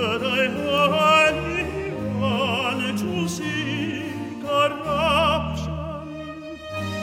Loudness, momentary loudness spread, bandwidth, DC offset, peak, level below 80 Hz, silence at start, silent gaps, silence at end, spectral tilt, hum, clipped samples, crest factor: -22 LUFS; 14 LU; 16.5 kHz; under 0.1%; -6 dBFS; -46 dBFS; 0 s; none; 0 s; -5 dB/octave; none; under 0.1%; 16 dB